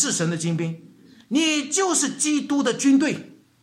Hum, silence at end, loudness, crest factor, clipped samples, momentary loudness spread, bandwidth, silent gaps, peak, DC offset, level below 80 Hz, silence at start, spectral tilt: none; 0.3 s; -21 LUFS; 16 dB; under 0.1%; 9 LU; 13.5 kHz; none; -8 dBFS; under 0.1%; -72 dBFS; 0 s; -3.5 dB/octave